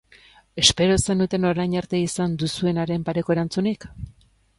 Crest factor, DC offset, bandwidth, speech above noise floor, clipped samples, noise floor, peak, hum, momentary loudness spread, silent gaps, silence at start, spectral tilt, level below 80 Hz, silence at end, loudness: 22 dB; under 0.1%; 11.5 kHz; 31 dB; under 0.1%; -53 dBFS; 0 dBFS; none; 16 LU; none; 0.55 s; -4.5 dB/octave; -44 dBFS; 0.45 s; -22 LUFS